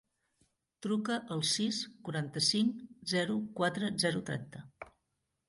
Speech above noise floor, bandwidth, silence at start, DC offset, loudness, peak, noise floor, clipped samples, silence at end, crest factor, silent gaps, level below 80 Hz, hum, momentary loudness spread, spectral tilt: 49 dB; 11.5 kHz; 0.8 s; under 0.1%; -33 LUFS; -16 dBFS; -83 dBFS; under 0.1%; 0.6 s; 20 dB; none; -72 dBFS; none; 17 LU; -4 dB/octave